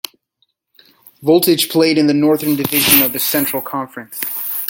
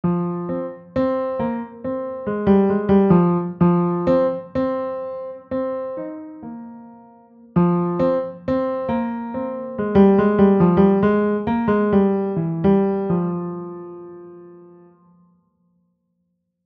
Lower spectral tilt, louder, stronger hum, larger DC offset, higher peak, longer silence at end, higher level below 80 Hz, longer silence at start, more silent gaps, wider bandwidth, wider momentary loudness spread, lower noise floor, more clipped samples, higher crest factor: second, -3.5 dB/octave vs -11 dB/octave; first, -14 LUFS vs -19 LUFS; neither; neither; about the same, 0 dBFS vs -2 dBFS; second, 0 s vs 2 s; second, -56 dBFS vs -48 dBFS; first, 1.2 s vs 0.05 s; neither; first, 17 kHz vs 4.6 kHz; second, 14 LU vs 17 LU; second, -65 dBFS vs -72 dBFS; neither; about the same, 16 dB vs 18 dB